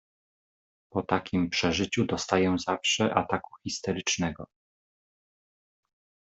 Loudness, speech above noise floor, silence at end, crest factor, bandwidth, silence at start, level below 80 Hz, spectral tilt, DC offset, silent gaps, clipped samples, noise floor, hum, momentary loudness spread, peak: -28 LUFS; over 62 dB; 1.9 s; 24 dB; 8.2 kHz; 0.95 s; -60 dBFS; -4 dB/octave; under 0.1%; none; under 0.1%; under -90 dBFS; none; 9 LU; -8 dBFS